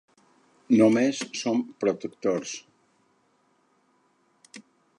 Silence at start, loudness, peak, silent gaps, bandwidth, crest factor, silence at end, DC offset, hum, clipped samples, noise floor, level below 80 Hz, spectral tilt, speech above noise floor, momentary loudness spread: 0.7 s; -25 LUFS; -8 dBFS; none; 11 kHz; 20 dB; 0.4 s; under 0.1%; none; under 0.1%; -67 dBFS; -76 dBFS; -5 dB/octave; 43 dB; 11 LU